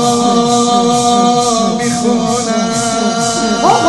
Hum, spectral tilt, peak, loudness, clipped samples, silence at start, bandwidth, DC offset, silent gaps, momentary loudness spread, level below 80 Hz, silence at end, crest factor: none; -3.5 dB/octave; 0 dBFS; -12 LUFS; under 0.1%; 0 s; 12.5 kHz; under 0.1%; none; 3 LU; -42 dBFS; 0 s; 12 dB